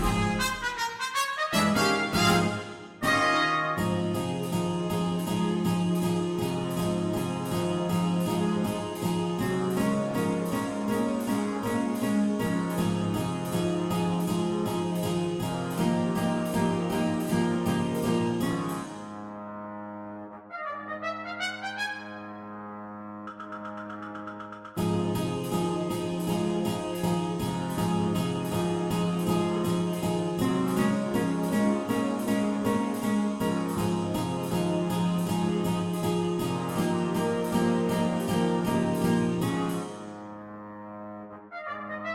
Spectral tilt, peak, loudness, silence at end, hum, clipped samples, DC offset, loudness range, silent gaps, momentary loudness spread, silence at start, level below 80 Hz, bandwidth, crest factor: -5.5 dB/octave; -10 dBFS; -28 LUFS; 0 s; none; under 0.1%; under 0.1%; 8 LU; none; 13 LU; 0 s; -52 dBFS; 16.5 kHz; 18 dB